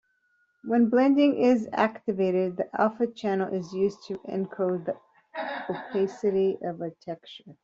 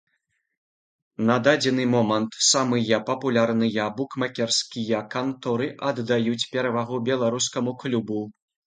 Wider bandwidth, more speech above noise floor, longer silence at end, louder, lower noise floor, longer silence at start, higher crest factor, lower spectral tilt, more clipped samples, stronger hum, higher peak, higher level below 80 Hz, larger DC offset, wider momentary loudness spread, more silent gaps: second, 7.6 kHz vs 9.6 kHz; second, 44 dB vs 51 dB; second, 0.1 s vs 0.35 s; second, -26 LUFS vs -23 LUFS; second, -70 dBFS vs -74 dBFS; second, 0.65 s vs 1.2 s; about the same, 20 dB vs 20 dB; first, -5.5 dB/octave vs -4 dB/octave; neither; neither; second, -8 dBFS vs -4 dBFS; about the same, -72 dBFS vs -68 dBFS; neither; first, 17 LU vs 8 LU; neither